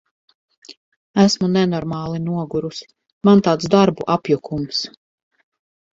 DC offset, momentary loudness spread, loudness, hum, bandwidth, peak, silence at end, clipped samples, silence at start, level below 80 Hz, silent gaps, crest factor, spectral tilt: under 0.1%; 11 LU; -18 LUFS; none; 7.8 kHz; 0 dBFS; 1.05 s; under 0.1%; 0.7 s; -54 dBFS; 0.77-1.14 s, 3.12-3.21 s; 20 dB; -6 dB/octave